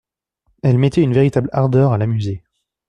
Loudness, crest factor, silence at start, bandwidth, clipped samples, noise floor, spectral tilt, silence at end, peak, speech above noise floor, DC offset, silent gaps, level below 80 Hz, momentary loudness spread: -16 LUFS; 14 dB; 0.65 s; 9.2 kHz; under 0.1%; -66 dBFS; -9 dB/octave; 0.5 s; -2 dBFS; 51 dB; under 0.1%; none; -48 dBFS; 8 LU